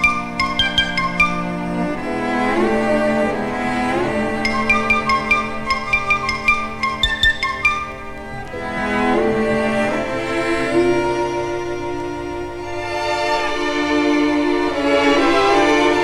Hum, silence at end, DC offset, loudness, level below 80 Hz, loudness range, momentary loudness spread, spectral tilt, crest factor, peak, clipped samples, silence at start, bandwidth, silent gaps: none; 0 s; under 0.1%; -18 LUFS; -38 dBFS; 4 LU; 10 LU; -4.5 dB/octave; 16 dB; -2 dBFS; under 0.1%; 0 s; 14.5 kHz; none